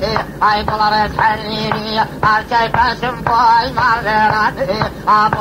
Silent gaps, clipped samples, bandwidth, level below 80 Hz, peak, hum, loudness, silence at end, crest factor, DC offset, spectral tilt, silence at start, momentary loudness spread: none; under 0.1%; 16 kHz; -36 dBFS; 0 dBFS; none; -14 LUFS; 0 s; 14 dB; under 0.1%; -5 dB/octave; 0 s; 6 LU